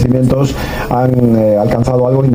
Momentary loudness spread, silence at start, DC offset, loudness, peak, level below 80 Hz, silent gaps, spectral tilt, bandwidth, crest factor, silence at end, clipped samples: 6 LU; 0 s; under 0.1%; -12 LUFS; 0 dBFS; -28 dBFS; none; -8 dB/octave; 15.5 kHz; 10 dB; 0 s; under 0.1%